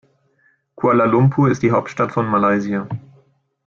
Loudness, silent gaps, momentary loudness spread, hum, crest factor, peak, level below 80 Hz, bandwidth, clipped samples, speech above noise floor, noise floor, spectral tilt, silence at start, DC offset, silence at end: -17 LUFS; none; 10 LU; none; 16 dB; -4 dBFS; -54 dBFS; 7.2 kHz; under 0.1%; 44 dB; -61 dBFS; -8.5 dB/octave; 0.8 s; under 0.1%; 0.65 s